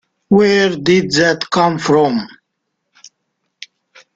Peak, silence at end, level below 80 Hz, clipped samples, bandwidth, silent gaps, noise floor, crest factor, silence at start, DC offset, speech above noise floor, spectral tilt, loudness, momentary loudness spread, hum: -2 dBFS; 1.9 s; -54 dBFS; under 0.1%; 9 kHz; none; -73 dBFS; 14 dB; 0.3 s; under 0.1%; 60 dB; -5 dB/octave; -13 LUFS; 5 LU; none